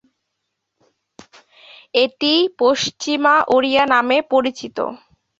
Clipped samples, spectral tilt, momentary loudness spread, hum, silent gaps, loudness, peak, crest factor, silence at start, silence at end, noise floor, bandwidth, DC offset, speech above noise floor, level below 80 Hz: under 0.1%; -2.5 dB/octave; 11 LU; none; none; -17 LUFS; -2 dBFS; 18 dB; 1.95 s; 0.45 s; -76 dBFS; 7.8 kHz; under 0.1%; 60 dB; -62 dBFS